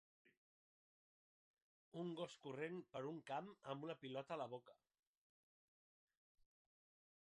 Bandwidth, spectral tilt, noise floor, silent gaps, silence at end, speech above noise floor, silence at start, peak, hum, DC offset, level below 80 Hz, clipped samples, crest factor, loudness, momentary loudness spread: 10 kHz; -6 dB/octave; under -90 dBFS; 0.37-1.54 s, 1.62-1.92 s; 2.45 s; over 39 dB; 0.25 s; -34 dBFS; none; under 0.1%; under -90 dBFS; under 0.1%; 20 dB; -51 LUFS; 4 LU